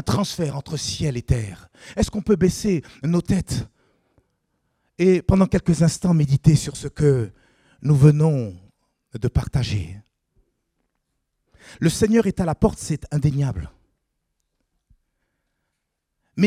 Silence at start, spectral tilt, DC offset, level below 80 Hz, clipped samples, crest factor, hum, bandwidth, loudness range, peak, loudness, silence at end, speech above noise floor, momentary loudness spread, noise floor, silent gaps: 0.05 s; -6.5 dB/octave; under 0.1%; -40 dBFS; under 0.1%; 20 dB; none; 14 kHz; 9 LU; -2 dBFS; -21 LUFS; 0 s; 58 dB; 14 LU; -78 dBFS; none